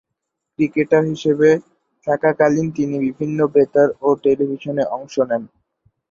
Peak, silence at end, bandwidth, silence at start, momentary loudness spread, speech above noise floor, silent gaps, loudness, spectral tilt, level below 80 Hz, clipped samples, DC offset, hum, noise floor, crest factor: -2 dBFS; 0.65 s; 7.4 kHz; 0.6 s; 7 LU; 62 dB; none; -18 LUFS; -7.5 dB/octave; -58 dBFS; under 0.1%; under 0.1%; none; -79 dBFS; 18 dB